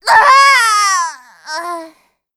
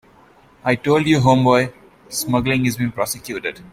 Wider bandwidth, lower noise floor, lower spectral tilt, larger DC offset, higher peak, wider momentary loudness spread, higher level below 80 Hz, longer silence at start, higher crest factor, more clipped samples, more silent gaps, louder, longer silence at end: about the same, 17 kHz vs 16.5 kHz; second, -46 dBFS vs -50 dBFS; second, 1.5 dB/octave vs -5.5 dB/octave; neither; about the same, 0 dBFS vs -2 dBFS; first, 19 LU vs 12 LU; second, -58 dBFS vs -48 dBFS; second, 0.05 s vs 0.65 s; second, 12 dB vs 18 dB; neither; neither; first, -8 LUFS vs -18 LUFS; first, 0.5 s vs 0.1 s